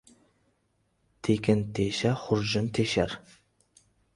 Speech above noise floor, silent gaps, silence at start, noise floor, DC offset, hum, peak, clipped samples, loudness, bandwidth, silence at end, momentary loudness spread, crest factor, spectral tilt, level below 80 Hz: 46 dB; none; 1.25 s; -73 dBFS; under 0.1%; none; -10 dBFS; under 0.1%; -28 LUFS; 11.5 kHz; 0.95 s; 6 LU; 20 dB; -5.5 dB/octave; -54 dBFS